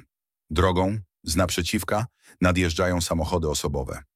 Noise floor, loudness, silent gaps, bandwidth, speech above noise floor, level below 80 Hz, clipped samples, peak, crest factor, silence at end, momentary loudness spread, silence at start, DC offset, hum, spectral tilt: -62 dBFS; -25 LUFS; none; 16 kHz; 37 dB; -38 dBFS; under 0.1%; -8 dBFS; 18 dB; 0.15 s; 7 LU; 0.5 s; under 0.1%; none; -5 dB/octave